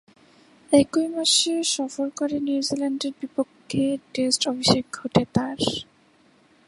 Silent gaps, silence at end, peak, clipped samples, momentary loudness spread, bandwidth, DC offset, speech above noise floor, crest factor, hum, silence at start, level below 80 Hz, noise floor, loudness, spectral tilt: none; 0.85 s; -2 dBFS; under 0.1%; 10 LU; 11.5 kHz; under 0.1%; 35 dB; 22 dB; none; 0.7 s; -56 dBFS; -58 dBFS; -23 LUFS; -3.5 dB/octave